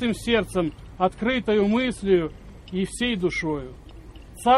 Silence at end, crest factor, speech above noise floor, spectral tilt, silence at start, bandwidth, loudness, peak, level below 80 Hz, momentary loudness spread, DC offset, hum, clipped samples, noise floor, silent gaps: 0 s; 18 dB; 19 dB; -5.5 dB/octave; 0 s; 13.5 kHz; -24 LUFS; -6 dBFS; -44 dBFS; 13 LU; under 0.1%; none; under 0.1%; -43 dBFS; none